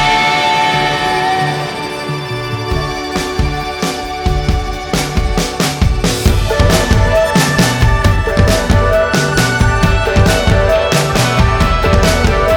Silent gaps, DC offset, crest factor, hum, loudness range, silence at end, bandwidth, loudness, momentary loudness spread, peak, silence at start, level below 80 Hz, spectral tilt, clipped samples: none; under 0.1%; 12 dB; none; 6 LU; 0 s; 19.5 kHz; -13 LUFS; 7 LU; 0 dBFS; 0 s; -18 dBFS; -5 dB/octave; under 0.1%